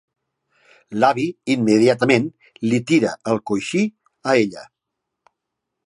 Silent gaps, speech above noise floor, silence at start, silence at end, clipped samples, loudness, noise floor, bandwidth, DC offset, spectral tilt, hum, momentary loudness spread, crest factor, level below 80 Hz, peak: none; 62 dB; 0.9 s; 1.2 s; under 0.1%; -19 LUFS; -81 dBFS; 11 kHz; under 0.1%; -5.5 dB/octave; none; 12 LU; 20 dB; -64 dBFS; 0 dBFS